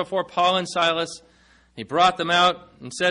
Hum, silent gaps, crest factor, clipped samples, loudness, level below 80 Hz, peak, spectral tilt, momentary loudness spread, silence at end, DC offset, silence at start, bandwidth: none; none; 16 dB; under 0.1%; -21 LUFS; -62 dBFS; -6 dBFS; -3 dB/octave; 17 LU; 0 s; under 0.1%; 0 s; 11 kHz